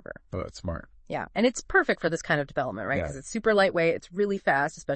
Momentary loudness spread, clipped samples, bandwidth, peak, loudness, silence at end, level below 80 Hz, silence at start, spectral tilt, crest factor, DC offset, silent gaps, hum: 13 LU; under 0.1%; 8.8 kHz; -10 dBFS; -27 LUFS; 0 s; -50 dBFS; 0.1 s; -5 dB/octave; 18 dB; under 0.1%; none; none